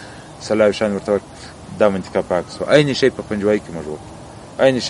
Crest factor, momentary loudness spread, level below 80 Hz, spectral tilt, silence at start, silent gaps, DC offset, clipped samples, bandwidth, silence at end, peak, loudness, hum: 18 dB; 20 LU; -48 dBFS; -5.5 dB/octave; 0 s; none; under 0.1%; under 0.1%; 11.5 kHz; 0 s; 0 dBFS; -18 LUFS; none